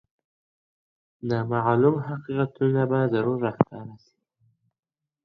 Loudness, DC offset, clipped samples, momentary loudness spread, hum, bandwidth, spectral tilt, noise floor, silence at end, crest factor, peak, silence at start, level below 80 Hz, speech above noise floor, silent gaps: -24 LUFS; under 0.1%; under 0.1%; 10 LU; none; 6 kHz; -10 dB/octave; -68 dBFS; 1.3 s; 26 dB; 0 dBFS; 1.25 s; -64 dBFS; 44 dB; none